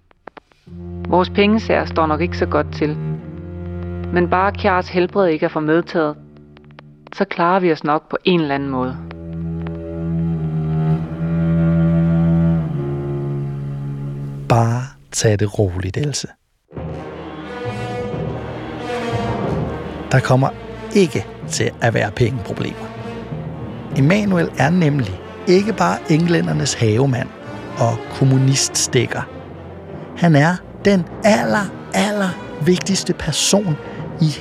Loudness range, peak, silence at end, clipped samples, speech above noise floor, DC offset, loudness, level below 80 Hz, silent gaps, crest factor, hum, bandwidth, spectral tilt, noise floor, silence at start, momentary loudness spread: 4 LU; -2 dBFS; 0 s; under 0.1%; 26 dB; under 0.1%; -18 LUFS; -44 dBFS; none; 16 dB; none; 14 kHz; -5.5 dB/octave; -42 dBFS; 0.65 s; 14 LU